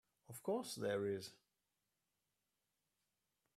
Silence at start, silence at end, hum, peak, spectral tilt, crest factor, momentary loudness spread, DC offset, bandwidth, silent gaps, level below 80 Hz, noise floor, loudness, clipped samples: 0.3 s; 2.2 s; 50 Hz at -70 dBFS; -30 dBFS; -4.5 dB/octave; 18 dB; 14 LU; under 0.1%; 15.5 kHz; none; -86 dBFS; -89 dBFS; -44 LUFS; under 0.1%